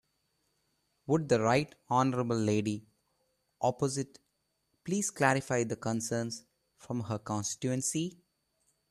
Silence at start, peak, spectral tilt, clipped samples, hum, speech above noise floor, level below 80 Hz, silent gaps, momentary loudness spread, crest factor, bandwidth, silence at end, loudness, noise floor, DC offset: 1.1 s; -10 dBFS; -5 dB/octave; under 0.1%; none; 48 dB; -68 dBFS; none; 12 LU; 22 dB; 13.5 kHz; 0.75 s; -32 LUFS; -79 dBFS; under 0.1%